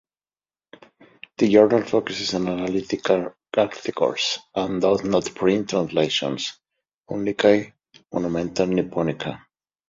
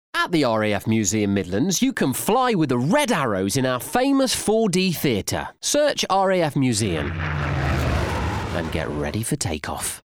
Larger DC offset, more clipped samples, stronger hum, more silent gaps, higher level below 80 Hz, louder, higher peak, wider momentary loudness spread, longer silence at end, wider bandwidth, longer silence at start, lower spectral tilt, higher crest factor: neither; neither; neither; first, 6.94-6.98 s vs none; second, -56 dBFS vs -40 dBFS; about the same, -22 LUFS vs -21 LUFS; first, -2 dBFS vs -6 dBFS; first, 11 LU vs 6 LU; first, 0.55 s vs 0.05 s; second, 7.8 kHz vs 19.5 kHz; first, 1.4 s vs 0.15 s; about the same, -5 dB/octave vs -4.5 dB/octave; about the same, 20 dB vs 16 dB